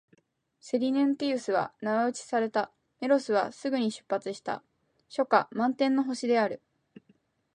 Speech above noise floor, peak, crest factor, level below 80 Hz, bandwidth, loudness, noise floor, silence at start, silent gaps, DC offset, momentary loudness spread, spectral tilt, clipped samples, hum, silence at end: 40 dB; -8 dBFS; 22 dB; -80 dBFS; 10.5 kHz; -29 LUFS; -68 dBFS; 0.65 s; none; under 0.1%; 11 LU; -4.5 dB/octave; under 0.1%; none; 1 s